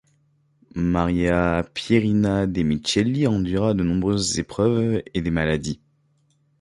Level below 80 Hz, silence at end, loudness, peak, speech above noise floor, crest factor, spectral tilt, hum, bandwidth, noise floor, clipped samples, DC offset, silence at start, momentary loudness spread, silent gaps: -40 dBFS; 0.85 s; -22 LUFS; -4 dBFS; 43 dB; 18 dB; -5.5 dB/octave; none; 11.5 kHz; -64 dBFS; under 0.1%; under 0.1%; 0.75 s; 5 LU; none